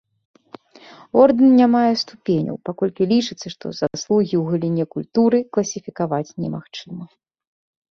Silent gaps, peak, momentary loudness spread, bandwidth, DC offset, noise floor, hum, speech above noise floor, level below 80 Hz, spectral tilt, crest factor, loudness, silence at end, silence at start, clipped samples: none; -2 dBFS; 17 LU; 7 kHz; under 0.1%; -46 dBFS; none; 27 dB; -60 dBFS; -6 dB/octave; 18 dB; -19 LUFS; 0.85 s; 1.15 s; under 0.1%